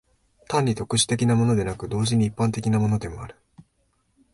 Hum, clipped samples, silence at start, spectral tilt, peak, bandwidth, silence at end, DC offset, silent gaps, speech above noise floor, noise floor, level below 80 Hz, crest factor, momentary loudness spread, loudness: none; under 0.1%; 0.5 s; -5.5 dB/octave; -8 dBFS; 11.5 kHz; 0.7 s; under 0.1%; none; 46 dB; -68 dBFS; -48 dBFS; 18 dB; 8 LU; -23 LUFS